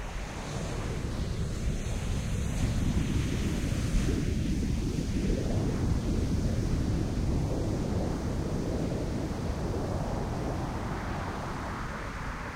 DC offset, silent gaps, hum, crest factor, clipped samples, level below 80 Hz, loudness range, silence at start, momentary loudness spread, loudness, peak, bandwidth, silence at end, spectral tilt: under 0.1%; none; none; 14 dB; under 0.1%; -34 dBFS; 3 LU; 0 s; 6 LU; -32 LUFS; -16 dBFS; 16 kHz; 0 s; -6.5 dB/octave